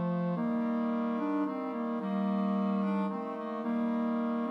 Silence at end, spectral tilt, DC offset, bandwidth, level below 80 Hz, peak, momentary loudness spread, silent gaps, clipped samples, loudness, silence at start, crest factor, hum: 0 s; -9.5 dB/octave; under 0.1%; 5.4 kHz; under -90 dBFS; -22 dBFS; 4 LU; none; under 0.1%; -32 LUFS; 0 s; 10 dB; none